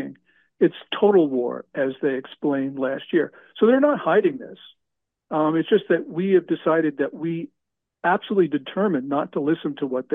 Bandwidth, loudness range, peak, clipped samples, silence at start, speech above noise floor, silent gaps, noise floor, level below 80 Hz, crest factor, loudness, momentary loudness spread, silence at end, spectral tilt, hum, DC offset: 3.9 kHz; 2 LU; -6 dBFS; under 0.1%; 0 s; 60 dB; none; -82 dBFS; -72 dBFS; 16 dB; -22 LUFS; 10 LU; 0 s; -9 dB/octave; none; under 0.1%